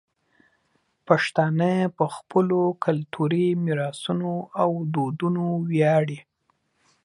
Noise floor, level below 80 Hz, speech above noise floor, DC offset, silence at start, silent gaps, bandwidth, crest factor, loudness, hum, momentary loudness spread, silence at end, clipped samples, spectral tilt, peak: -70 dBFS; -70 dBFS; 47 dB; under 0.1%; 1.1 s; none; 11.5 kHz; 20 dB; -24 LUFS; none; 6 LU; 0.85 s; under 0.1%; -7.5 dB/octave; -4 dBFS